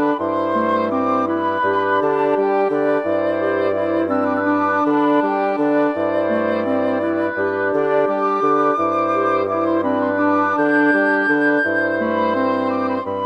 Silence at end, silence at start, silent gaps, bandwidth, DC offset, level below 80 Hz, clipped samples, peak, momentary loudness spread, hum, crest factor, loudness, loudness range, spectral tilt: 0 s; 0 s; none; 6.4 kHz; under 0.1%; -64 dBFS; under 0.1%; -4 dBFS; 4 LU; none; 14 dB; -18 LUFS; 1 LU; -7.5 dB/octave